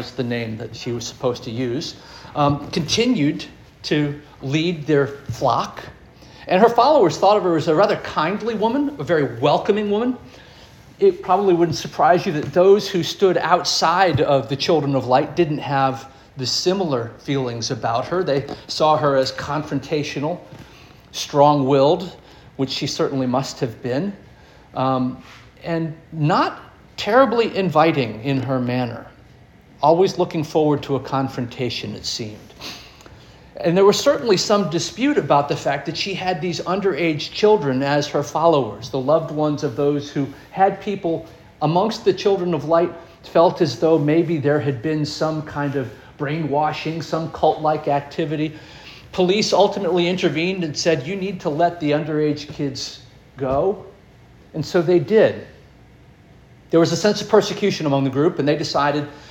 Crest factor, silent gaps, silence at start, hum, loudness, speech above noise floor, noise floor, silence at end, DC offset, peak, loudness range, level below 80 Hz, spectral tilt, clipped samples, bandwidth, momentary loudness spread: 18 dB; none; 0 s; none; -20 LUFS; 28 dB; -47 dBFS; 0 s; under 0.1%; -2 dBFS; 5 LU; -52 dBFS; -5.5 dB/octave; under 0.1%; 17 kHz; 12 LU